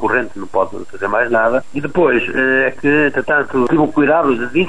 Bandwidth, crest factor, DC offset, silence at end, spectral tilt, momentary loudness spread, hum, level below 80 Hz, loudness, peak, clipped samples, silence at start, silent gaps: 10.5 kHz; 12 dB; 4%; 0 s; -7 dB/octave; 6 LU; none; -46 dBFS; -15 LUFS; -2 dBFS; under 0.1%; 0 s; none